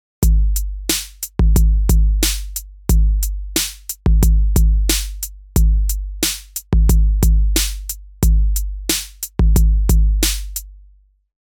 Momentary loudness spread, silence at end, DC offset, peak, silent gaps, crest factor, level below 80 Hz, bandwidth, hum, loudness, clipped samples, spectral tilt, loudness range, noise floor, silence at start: 10 LU; 0.65 s; under 0.1%; -2 dBFS; none; 14 dB; -16 dBFS; 19.5 kHz; none; -18 LUFS; under 0.1%; -4 dB/octave; 1 LU; -50 dBFS; 0.2 s